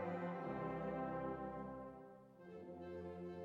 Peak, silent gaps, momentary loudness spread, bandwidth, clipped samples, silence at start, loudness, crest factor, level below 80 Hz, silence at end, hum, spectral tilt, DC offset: -34 dBFS; none; 14 LU; 7.4 kHz; under 0.1%; 0 s; -47 LUFS; 14 dB; -70 dBFS; 0 s; none; -9 dB/octave; under 0.1%